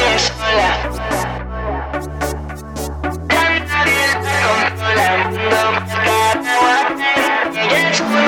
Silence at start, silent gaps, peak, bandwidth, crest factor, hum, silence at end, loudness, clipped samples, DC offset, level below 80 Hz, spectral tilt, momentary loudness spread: 0 s; none; -2 dBFS; 18 kHz; 14 dB; none; 0 s; -15 LUFS; under 0.1%; under 0.1%; -32 dBFS; -3.5 dB/octave; 10 LU